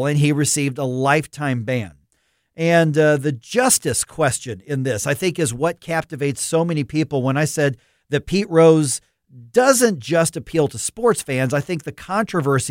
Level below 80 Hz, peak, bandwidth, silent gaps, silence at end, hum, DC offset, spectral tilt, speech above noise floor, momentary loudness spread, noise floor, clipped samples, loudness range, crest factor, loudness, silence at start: -52 dBFS; 0 dBFS; 16.5 kHz; none; 0 s; none; under 0.1%; -4.5 dB/octave; 48 dB; 10 LU; -67 dBFS; under 0.1%; 4 LU; 18 dB; -19 LUFS; 0 s